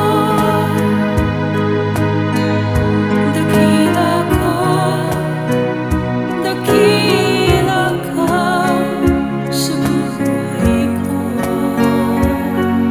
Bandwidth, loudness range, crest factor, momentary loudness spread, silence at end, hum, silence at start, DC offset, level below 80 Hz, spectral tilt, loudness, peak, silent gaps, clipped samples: 20 kHz; 2 LU; 14 dB; 5 LU; 0 s; none; 0 s; under 0.1%; -32 dBFS; -6 dB/octave; -15 LUFS; 0 dBFS; none; under 0.1%